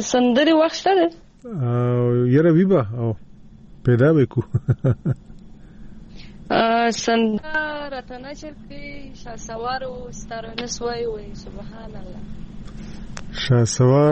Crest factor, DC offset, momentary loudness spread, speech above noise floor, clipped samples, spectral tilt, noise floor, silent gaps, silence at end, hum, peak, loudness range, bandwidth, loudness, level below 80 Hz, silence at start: 20 dB; under 0.1%; 22 LU; 23 dB; under 0.1%; -6 dB/octave; -43 dBFS; none; 0 s; none; -2 dBFS; 12 LU; 8.4 kHz; -20 LUFS; -42 dBFS; 0 s